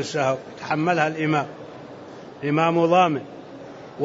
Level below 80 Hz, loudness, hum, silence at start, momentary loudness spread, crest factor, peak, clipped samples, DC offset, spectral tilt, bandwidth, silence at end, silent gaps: -66 dBFS; -22 LUFS; none; 0 s; 22 LU; 18 dB; -6 dBFS; under 0.1%; under 0.1%; -6 dB/octave; 8 kHz; 0 s; none